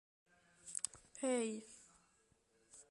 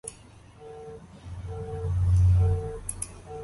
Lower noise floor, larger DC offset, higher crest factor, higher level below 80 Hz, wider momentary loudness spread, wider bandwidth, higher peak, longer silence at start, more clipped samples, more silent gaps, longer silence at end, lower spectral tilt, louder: first, -76 dBFS vs -51 dBFS; neither; first, 30 dB vs 14 dB; second, -82 dBFS vs -34 dBFS; about the same, 22 LU vs 23 LU; about the same, 11.5 kHz vs 11.5 kHz; second, -18 dBFS vs -14 dBFS; first, 0.65 s vs 0.05 s; neither; neither; about the same, 0.1 s vs 0 s; second, -2.5 dB/octave vs -6.5 dB/octave; second, -43 LUFS vs -27 LUFS